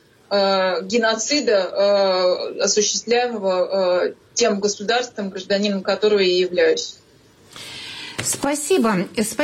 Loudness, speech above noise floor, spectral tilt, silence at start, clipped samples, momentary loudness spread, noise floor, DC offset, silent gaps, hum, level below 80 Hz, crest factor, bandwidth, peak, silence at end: -19 LUFS; 32 dB; -3 dB/octave; 0.3 s; under 0.1%; 9 LU; -51 dBFS; under 0.1%; none; none; -62 dBFS; 12 dB; 16 kHz; -8 dBFS; 0 s